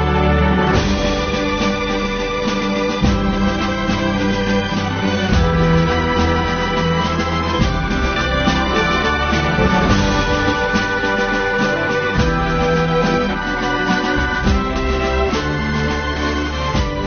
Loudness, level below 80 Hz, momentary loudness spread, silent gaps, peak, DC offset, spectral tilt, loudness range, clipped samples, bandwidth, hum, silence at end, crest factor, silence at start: -17 LUFS; -26 dBFS; 4 LU; none; -2 dBFS; under 0.1%; -4 dB/octave; 2 LU; under 0.1%; 6.6 kHz; none; 0 s; 14 dB; 0 s